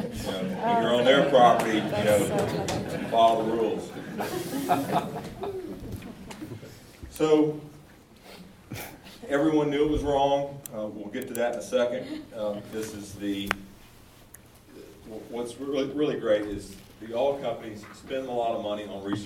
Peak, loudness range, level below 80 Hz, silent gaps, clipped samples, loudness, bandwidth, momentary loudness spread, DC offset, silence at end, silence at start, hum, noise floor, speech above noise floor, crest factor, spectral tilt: -2 dBFS; 9 LU; -52 dBFS; none; under 0.1%; -27 LUFS; 17.5 kHz; 20 LU; under 0.1%; 0 s; 0 s; none; -52 dBFS; 26 dB; 26 dB; -5 dB/octave